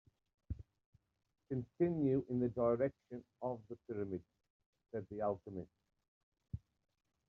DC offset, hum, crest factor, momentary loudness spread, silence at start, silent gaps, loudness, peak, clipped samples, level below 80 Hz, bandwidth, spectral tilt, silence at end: under 0.1%; none; 20 dB; 17 LU; 0.5 s; 0.86-0.93 s, 4.50-4.60 s, 4.66-4.73 s, 6.08-6.32 s; -40 LUFS; -22 dBFS; under 0.1%; -64 dBFS; 4.2 kHz; -10.5 dB/octave; 0.7 s